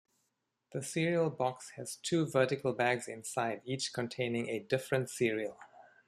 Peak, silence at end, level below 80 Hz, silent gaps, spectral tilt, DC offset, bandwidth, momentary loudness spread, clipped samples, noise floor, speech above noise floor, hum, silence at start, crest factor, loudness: -14 dBFS; 0.25 s; -74 dBFS; none; -5 dB/octave; under 0.1%; 14.5 kHz; 9 LU; under 0.1%; -83 dBFS; 49 dB; none; 0.7 s; 20 dB; -34 LUFS